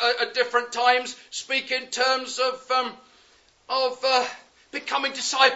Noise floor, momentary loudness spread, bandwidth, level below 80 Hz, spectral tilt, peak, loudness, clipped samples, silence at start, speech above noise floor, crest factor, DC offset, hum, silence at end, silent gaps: -58 dBFS; 12 LU; 8 kHz; -76 dBFS; 0.5 dB/octave; -2 dBFS; -24 LUFS; under 0.1%; 0 s; 34 dB; 24 dB; under 0.1%; none; 0 s; none